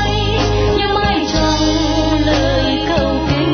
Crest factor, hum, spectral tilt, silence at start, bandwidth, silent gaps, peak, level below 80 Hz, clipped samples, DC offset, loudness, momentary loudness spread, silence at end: 12 dB; none; -5.5 dB/octave; 0 s; 6.6 kHz; none; -2 dBFS; -24 dBFS; under 0.1%; under 0.1%; -15 LUFS; 2 LU; 0 s